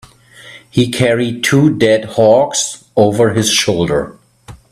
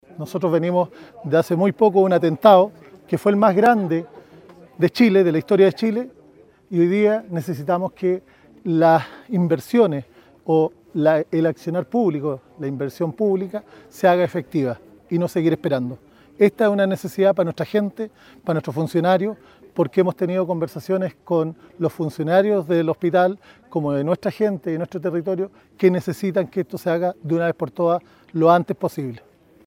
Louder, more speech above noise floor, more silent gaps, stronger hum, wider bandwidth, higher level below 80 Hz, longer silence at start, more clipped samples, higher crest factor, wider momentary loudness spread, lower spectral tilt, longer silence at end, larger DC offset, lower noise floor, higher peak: first, -13 LUFS vs -20 LUFS; second, 27 dB vs 31 dB; neither; neither; about the same, 15 kHz vs 16.5 kHz; first, -46 dBFS vs -64 dBFS; first, 0.45 s vs 0.2 s; neither; second, 14 dB vs 20 dB; second, 7 LU vs 12 LU; second, -4.5 dB/octave vs -7.5 dB/octave; second, 0.15 s vs 0.5 s; neither; second, -39 dBFS vs -51 dBFS; about the same, 0 dBFS vs 0 dBFS